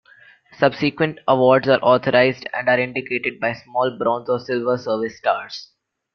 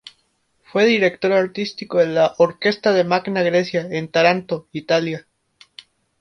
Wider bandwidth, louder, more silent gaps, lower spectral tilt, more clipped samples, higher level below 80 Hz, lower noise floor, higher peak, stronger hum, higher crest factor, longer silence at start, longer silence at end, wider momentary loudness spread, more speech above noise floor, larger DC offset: second, 6.6 kHz vs 9.6 kHz; about the same, -19 LUFS vs -19 LUFS; neither; about the same, -6.5 dB/octave vs -5.5 dB/octave; neither; about the same, -62 dBFS vs -64 dBFS; second, -50 dBFS vs -66 dBFS; about the same, -2 dBFS vs -2 dBFS; neither; about the same, 18 dB vs 18 dB; second, 0.6 s vs 0.75 s; second, 0.5 s vs 1 s; about the same, 9 LU vs 9 LU; second, 31 dB vs 47 dB; neither